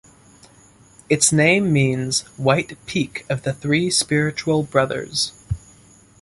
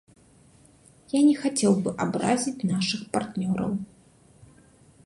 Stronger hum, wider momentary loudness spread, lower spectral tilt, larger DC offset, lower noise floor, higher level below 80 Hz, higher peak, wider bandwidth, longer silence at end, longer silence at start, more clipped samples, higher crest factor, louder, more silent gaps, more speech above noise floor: neither; about the same, 10 LU vs 9 LU; about the same, -4 dB/octave vs -5 dB/octave; neither; second, -50 dBFS vs -56 dBFS; first, -46 dBFS vs -60 dBFS; first, -2 dBFS vs -8 dBFS; about the same, 11.5 kHz vs 11.5 kHz; second, 0.65 s vs 1.2 s; about the same, 1.1 s vs 1.15 s; neither; about the same, 18 dB vs 18 dB; first, -19 LUFS vs -25 LUFS; neither; about the same, 31 dB vs 32 dB